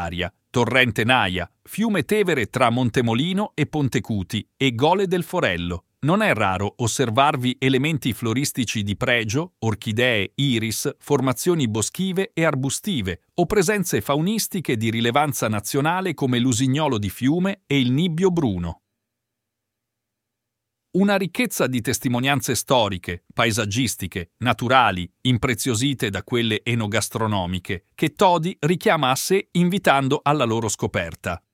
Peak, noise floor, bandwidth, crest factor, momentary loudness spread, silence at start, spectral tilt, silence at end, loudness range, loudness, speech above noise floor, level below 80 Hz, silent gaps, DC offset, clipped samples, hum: 0 dBFS; -82 dBFS; 17 kHz; 22 dB; 7 LU; 0 s; -4.5 dB/octave; 0.15 s; 3 LU; -21 LUFS; 60 dB; -50 dBFS; none; under 0.1%; under 0.1%; none